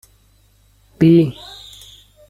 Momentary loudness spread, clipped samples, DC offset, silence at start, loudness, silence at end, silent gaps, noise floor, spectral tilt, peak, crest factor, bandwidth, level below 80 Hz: 24 LU; under 0.1%; under 0.1%; 1 s; -14 LUFS; 0.95 s; none; -54 dBFS; -8.5 dB/octave; -2 dBFS; 18 dB; 12.5 kHz; -50 dBFS